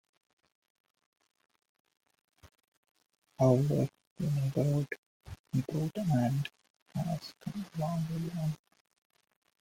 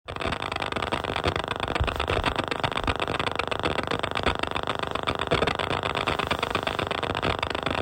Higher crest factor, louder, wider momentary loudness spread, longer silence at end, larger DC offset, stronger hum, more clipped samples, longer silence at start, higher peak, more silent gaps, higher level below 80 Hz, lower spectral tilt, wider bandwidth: about the same, 22 dB vs 20 dB; second, -33 LUFS vs -27 LUFS; first, 14 LU vs 3 LU; first, 1.05 s vs 0 s; neither; neither; neither; first, 2.45 s vs 0.05 s; second, -12 dBFS vs -8 dBFS; first, 2.68-2.83 s, 2.91-2.95 s, 3.18-3.22 s, 4.07-4.16 s, 4.98-5.20 s, 5.40-5.44 s, 6.70-6.86 s vs none; second, -64 dBFS vs -42 dBFS; first, -8 dB/octave vs -4.5 dB/octave; about the same, 16.5 kHz vs 16 kHz